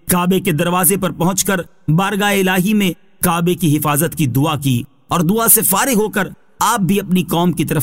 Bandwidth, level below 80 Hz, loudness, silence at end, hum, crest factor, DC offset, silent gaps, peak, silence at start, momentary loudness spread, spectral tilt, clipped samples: 16.5 kHz; -44 dBFS; -15 LUFS; 0 s; none; 16 dB; 0.7%; none; 0 dBFS; 0.05 s; 7 LU; -4.5 dB/octave; under 0.1%